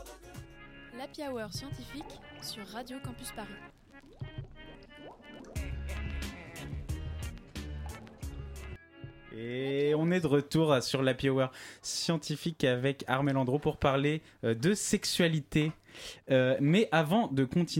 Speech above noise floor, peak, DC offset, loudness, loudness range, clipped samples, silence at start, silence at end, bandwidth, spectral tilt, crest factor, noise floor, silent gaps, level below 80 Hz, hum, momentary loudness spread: 20 dB; -12 dBFS; under 0.1%; -31 LUFS; 14 LU; under 0.1%; 0 s; 0 s; 16.5 kHz; -5.5 dB/octave; 20 dB; -51 dBFS; none; -48 dBFS; none; 21 LU